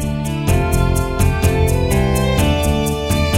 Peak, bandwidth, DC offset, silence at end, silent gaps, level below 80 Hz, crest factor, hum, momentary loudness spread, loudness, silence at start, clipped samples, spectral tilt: -2 dBFS; 16.5 kHz; under 0.1%; 0 s; none; -22 dBFS; 14 dB; none; 3 LU; -17 LUFS; 0 s; under 0.1%; -5.5 dB/octave